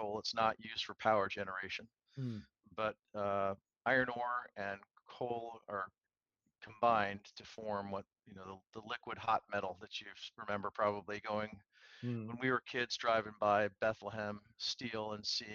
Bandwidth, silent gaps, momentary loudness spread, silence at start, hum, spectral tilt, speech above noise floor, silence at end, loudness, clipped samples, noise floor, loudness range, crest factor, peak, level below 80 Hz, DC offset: 7.6 kHz; none; 16 LU; 0 s; none; -4.5 dB/octave; 47 dB; 0 s; -39 LUFS; under 0.1%; -87 dBFS; 4 LU; 22 dB; -18 dBFS; -76 dBFS; under 0.1%